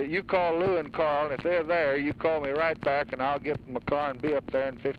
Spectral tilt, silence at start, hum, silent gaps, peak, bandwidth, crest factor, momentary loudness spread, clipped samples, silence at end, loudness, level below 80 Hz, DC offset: -7.5 dB/octave; 0 s; none; none; -12 dBFS; 5.6 kHz; 14 dB; 5 LU; under 0.1%; 0 s; -28 LUFS; -54 dBFS; under 0.1%